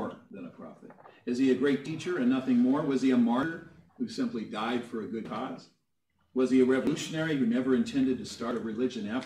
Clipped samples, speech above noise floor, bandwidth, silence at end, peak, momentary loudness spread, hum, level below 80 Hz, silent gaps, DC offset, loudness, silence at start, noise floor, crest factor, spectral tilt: under 0.1%; 48 dB; 10.5 kHz; 0 s; -12 dBFS; 17 LU; none; -70 dBFS; none; under 0.1%; -29 LUFS; 0 s; -76 dBFS; 16 dB; -6 dB/octave